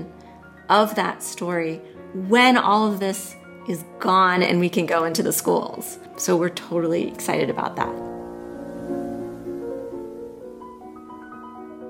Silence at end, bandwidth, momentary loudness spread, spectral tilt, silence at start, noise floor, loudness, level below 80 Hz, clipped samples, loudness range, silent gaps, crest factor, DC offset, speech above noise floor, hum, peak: 0 s; 16.5 kHz; 22 LU; -4 dB/octave; 0 s; -44 dBFS; -22 LUFS; -60 dBFS; under 0.1%; 13 LU; none; 20 dB; under 0.1%; 23 dB; none; -2 dBFS